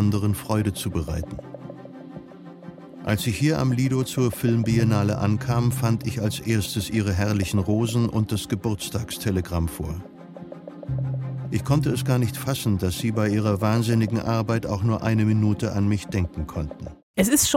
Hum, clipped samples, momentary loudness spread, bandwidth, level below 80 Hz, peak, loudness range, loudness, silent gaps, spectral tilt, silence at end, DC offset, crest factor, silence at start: none; under 0.1%; 18 LU; 16.5 kHz; -46 dBFS; -6 dBFS; 5 LU; -24 LUFS; 17.03-17.14 s; -5.5 dB/octave; 0 s; under 0.1%; 18 dB; 0 s